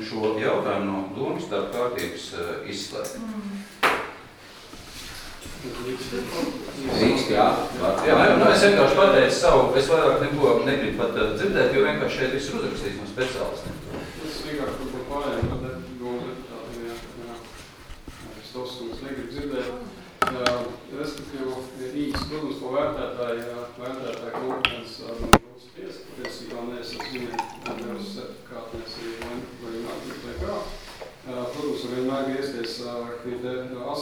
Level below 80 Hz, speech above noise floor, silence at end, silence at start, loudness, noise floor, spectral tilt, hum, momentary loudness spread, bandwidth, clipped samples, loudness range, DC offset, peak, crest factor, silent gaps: -44 dBFS; 22 dB; 0 s; 0 s; -25 LUFS; -45 dBFS; -4.5 dB/octave; none; 19 LU; over 20 kHz; under 0.1%; 16 LU; under 0.1%; 0 dBFS; 26 dB; none